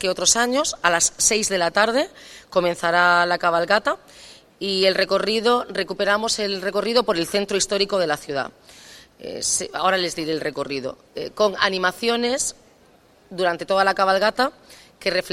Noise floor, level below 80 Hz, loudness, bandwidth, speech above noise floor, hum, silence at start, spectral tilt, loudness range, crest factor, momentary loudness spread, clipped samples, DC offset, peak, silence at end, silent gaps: -54 dBFS; -56 dBFS; -20 LUFS; 16 kHz; 33 dB; none; 0 s; -2 dB/octave; 5 LU; 22 dB; 10 LU; under 0.1%; under 0.1%; 0 dBFS; 0 s; none